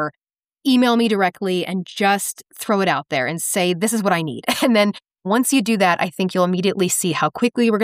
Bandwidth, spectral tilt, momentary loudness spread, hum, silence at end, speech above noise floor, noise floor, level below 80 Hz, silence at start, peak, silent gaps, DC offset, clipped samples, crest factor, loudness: 15.5 kHz; -4 dB/octave; 6 LU; none; 0 s; 59 dB; -77 dBFS; -68 dBFS; 0 s; -4 dBFS; none; under 0.1%; under 0.1%; 14 dB; -19 LUFS